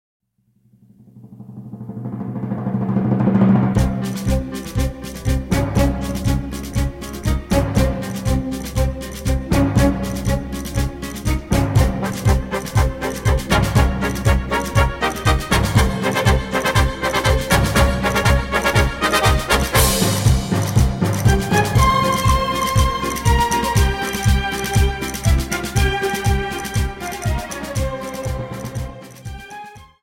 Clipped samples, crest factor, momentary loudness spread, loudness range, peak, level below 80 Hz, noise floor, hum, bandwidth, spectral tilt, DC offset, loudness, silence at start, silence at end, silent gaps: under 0.1%; 16 dB; 10 LU; 5 LU; -2 dBFS; -24 dBFS; -60 dBFS; none; 16.5 kHz; -5 dB/octave; under 0.1%; -19 LUFS; 1.15 s; 0.2 s; none